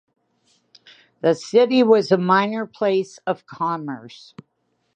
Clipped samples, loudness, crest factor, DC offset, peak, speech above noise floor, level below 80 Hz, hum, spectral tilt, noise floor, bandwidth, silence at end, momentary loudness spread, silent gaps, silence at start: under 0.1%; -19 LUFS; 20 dB; under 0.1%; -2 dBFS; 45 dB; -74 dBFS; none; -6 dB/octave; -64 dBFS; 9 kHz; 0.9 s; 13 LU; none; 1.25 s